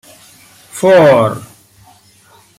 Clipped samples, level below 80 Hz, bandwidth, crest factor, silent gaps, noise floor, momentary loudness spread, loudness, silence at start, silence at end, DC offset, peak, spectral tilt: under 0.1%; -52 dBFS; 15.5 kHz; 14 dB; none; -46 dBFS; 21 LU; -10 LUFS; 0.75 s; 1.15 s; under 0.1%; -2 dBFS; -6 dB/octave